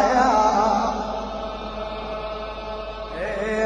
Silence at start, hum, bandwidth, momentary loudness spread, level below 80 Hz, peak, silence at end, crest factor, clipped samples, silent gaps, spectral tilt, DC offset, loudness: 0 s; none; 10 kHz; 14 LU; -40 dBFS; -6 dBFS; 0 s; 16 dB; under 0.1%; none; -4.5 dB/octave; under 0.1%; -24 LUFS